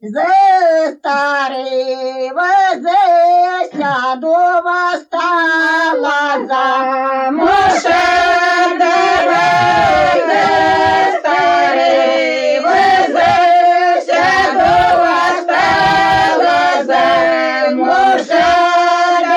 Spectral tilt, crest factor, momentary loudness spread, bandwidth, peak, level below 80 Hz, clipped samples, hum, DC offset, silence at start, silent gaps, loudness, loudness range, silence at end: -3.5 dB/octave; 10 dB; 6 LU; 10.5 kHz; -2 dBFS; -46 dBFS; under 0.1%; none; under 0.1%; 0.05 s; none; -12 LUFS; 3 LU; 0 s